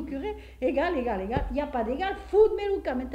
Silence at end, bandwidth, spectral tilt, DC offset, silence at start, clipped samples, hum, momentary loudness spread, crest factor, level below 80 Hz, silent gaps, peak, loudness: 0 s; 8.6 kHz; -7.5 dB/octave; under 0.1%; 0 s; under 0.1%; none; 9 LU; 16 dB; -42 dBFS; none; -10 dBFS; -28 LUFS